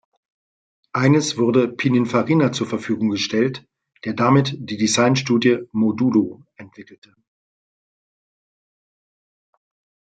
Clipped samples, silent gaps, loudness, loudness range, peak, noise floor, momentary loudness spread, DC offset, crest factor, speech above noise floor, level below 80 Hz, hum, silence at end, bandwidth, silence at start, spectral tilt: under 0.1%; none; -19 LUFS; 6 LU; -4 dBFS; under -90 dBFS; 8 LU; under 0.1%; 18 dB; over 71 dB; -64 dBFS; none; 3.3 s; 9.2 kHz; 0.95 s; -5.5 dB/octave